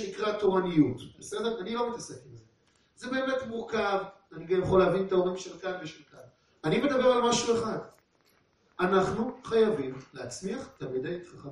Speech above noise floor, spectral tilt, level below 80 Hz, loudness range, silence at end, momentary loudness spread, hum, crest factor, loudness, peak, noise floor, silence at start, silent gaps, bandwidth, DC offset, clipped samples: 39 dB; -5 dB/octave; -58 dBFS; 5 LU; 0 s; 16 LU; none; 18 dB; -29 LUFS; -12 dBFS; -67 dBFS; 0 s; none; 11.5 kHz; under 0.1%; under 0.1%